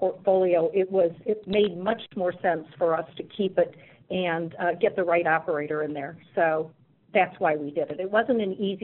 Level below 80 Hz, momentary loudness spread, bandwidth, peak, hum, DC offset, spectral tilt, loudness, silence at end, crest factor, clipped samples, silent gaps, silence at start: -64 dBFS; 7 LU; 4.2 kHz; -8 dBFS; none; under 0.1%; -4 dB/octave; -26 LUFS; 0.05 s; 18 dB; under 0.1%; none; 0 s